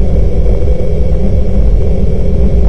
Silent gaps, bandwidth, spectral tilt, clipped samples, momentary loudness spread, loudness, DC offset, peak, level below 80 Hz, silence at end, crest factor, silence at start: none; 5.8 kHz; -10 dB/octave; 1%; 2 LU; -13 LUFS; under 0.1%; 0 dBFS; -10 dBFS; 0 s; 6 dB; 0 s